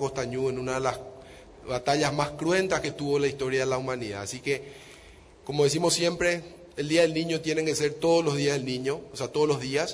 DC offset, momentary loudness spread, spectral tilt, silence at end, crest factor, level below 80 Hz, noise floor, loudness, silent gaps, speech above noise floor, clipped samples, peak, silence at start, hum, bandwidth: under 0.1%; 11 LU; -4.5 dB/octave; 0 s; 16 dB; -56 dBFS; -51 dBFS; -27 LUFS; none; 24 dB; under 0.1%; -10 dBFS; 0 s; none; 11 kHz